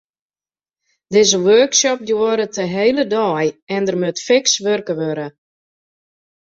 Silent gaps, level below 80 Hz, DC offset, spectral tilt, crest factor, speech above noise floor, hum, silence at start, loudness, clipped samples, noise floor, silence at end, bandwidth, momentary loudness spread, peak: 3.62-3.67 s; -62 dBFS; under 0.1%; -3 dB/octave; 18 dB; over 74 dB; none; 1.1 s; -16 LUFS; under 0.1%; under -90 dBFS; 1.3 s; 8 kHz; 10 LU; 0 dBFS